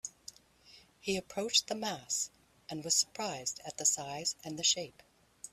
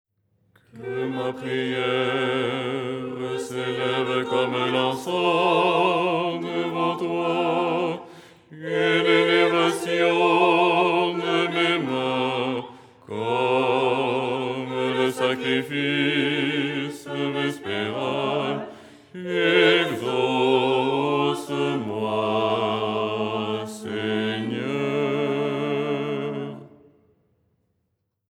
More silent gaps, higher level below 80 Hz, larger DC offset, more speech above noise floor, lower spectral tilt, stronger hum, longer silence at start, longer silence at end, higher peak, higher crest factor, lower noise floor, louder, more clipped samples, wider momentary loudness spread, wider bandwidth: neither; about the same, -72 dBFS vs -74 dBFS; neither; second, 26 dB vs 52 dB; second, -1 dB/octave vs -5.5 dB/octave; neither; second, 0.05 s vs 0.75 s; second, 0.05 s vs 1.6 s; second, -14 dBFS vs -4 dBFS; first, 24 dB vs 18 dB; second, -61 dBFS vs -75 dBFS; second, -33 LUFS vs -23 LUFS; neither; first, 15 LU vs 10 LU; about the same, 15.5 kHz vs 15 kHz